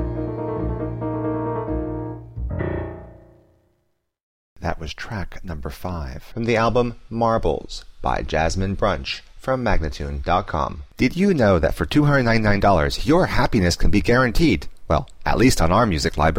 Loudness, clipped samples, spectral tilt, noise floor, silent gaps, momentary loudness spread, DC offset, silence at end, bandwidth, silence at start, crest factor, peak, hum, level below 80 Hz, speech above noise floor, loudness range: -21 LUFS; under 0.1%; -6 dB/octave; -70 dBFS; 4.23-4.56 s; 13 LU; under 0.1%; 0 s; 16 kHz; 0 s; 16 dB; -6 dBFS; none; -30 dBFS; 51 dB; 13 LU